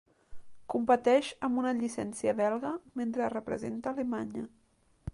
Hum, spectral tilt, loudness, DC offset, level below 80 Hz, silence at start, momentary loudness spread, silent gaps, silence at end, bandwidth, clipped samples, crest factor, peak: none; -5.5 dB/octave; -31 LUFS; under 0.1%; -60 dBFS; 0.3 s; 10 LU; none; 0 s; 11.5 kHz; under 0.1%; 18 dB; -14 dBFS